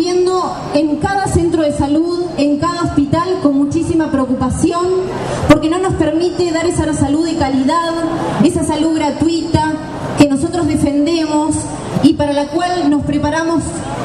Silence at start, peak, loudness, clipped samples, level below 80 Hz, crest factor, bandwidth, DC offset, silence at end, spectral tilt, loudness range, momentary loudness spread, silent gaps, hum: 0 s; 0 dBFS; -15 LUFS; under 0.1%; -34 dBFS; 14 dB; 12 kHz; under 0.1%; 0 s; -5.5 dB/octave; 1 LU; 5 LU; none; none